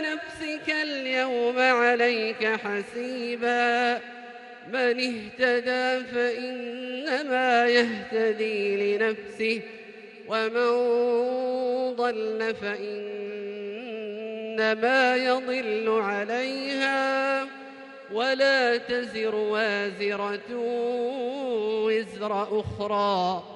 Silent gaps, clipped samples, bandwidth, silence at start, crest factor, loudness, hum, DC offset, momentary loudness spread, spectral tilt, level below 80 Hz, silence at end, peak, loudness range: none; under 0.1%; 11 kHz; 0 s; 18 dB; -26 LUFS; none; under 0.1%; 13 LU; -4 dB/octave; -66 dBFS; 0 s; -8 dBFS; 3 LU